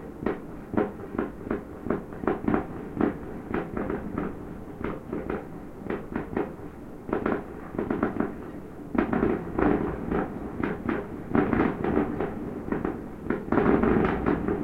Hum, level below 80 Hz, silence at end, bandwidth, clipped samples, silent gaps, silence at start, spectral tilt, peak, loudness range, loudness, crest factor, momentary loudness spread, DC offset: none; -44 dBFS; 0 s; 15.5 kHz; under 0.1%; none; 0 s; -9 dB/octave; -6 dBFS; 7 LU; -29 LUFS; 22 dB; 11 LU; under 0.1%